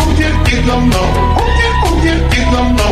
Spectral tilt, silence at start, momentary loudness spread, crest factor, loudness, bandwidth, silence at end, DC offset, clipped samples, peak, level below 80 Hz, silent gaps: -5.5 dB/octave; 0 s; 1 LU; 10 dB; -12 LUFS; 14.5 kHz; 0 s; under 0.1%; under 0.1%; 0 dBFS; -14 dBFS; none